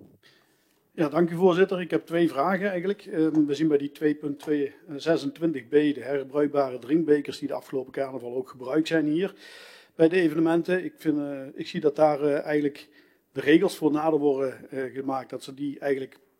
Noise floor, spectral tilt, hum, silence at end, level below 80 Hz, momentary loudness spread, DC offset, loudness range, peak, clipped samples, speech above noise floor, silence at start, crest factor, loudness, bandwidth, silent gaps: -66 dBFS; -7 dB/octave; none; 0.35 s; -78 dBFS; 12 LU; under 0.1%; 2 LU; -6 dBFS; under 0.1%; 41 dB; 0.95 s; 20 dB; -26 LUFS; 15.5 kHz; none